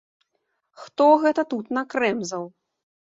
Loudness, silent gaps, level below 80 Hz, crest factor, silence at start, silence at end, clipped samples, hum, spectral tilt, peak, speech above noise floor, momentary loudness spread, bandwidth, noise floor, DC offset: -22 LUFS; none; -74 dBFS; 20 dB; 0.8 s; 0.65 s; under 0.1%; none; -4.5 dB/octave; -4 dBFS; 53 dB; 17 LU; 7.8 kHz; -75 dBFS; under 0.1%